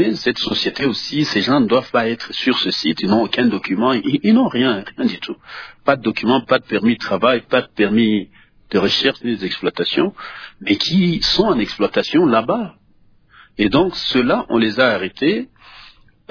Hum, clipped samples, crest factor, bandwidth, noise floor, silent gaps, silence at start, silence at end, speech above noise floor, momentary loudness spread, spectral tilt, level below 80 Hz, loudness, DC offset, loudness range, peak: none; under 0.1%; 18 dB; 5.4 kHz; -52 dBFS; none; 0 s; 0.45 s; 35 dB; 7 LU; -5.5 dB/octave; -48 dBFS; -17 LUFS; under 0.1%; 1 LU; 0 dBFS